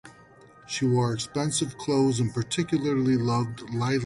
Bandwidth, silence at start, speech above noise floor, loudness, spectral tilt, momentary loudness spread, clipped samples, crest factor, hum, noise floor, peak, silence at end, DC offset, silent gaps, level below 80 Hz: 11.5 kHz; 0.05 s; 27 dB; -26 LUFS; -5.5 dB/octave; 5 LU; under 0.1%; 12 dB; none; -52 dBFS; -14 dBFS; 0 s; under 0.1%; none; -58 dBFS